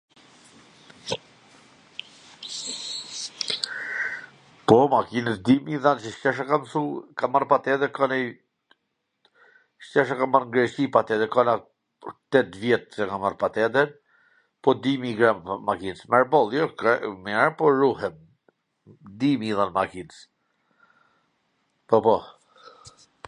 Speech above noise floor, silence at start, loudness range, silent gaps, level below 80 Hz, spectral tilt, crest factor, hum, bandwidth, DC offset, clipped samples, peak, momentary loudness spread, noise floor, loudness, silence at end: 54 dB; 1.05 s; 7 LU; none; -64 dBFS; -5 dB/octave; 24 dB; none; 10.5 kHz; under 0.1%; under 0.1%; -2 dBFS; 13 LU; -77 dBFS; -24 LUFS; 0.4 s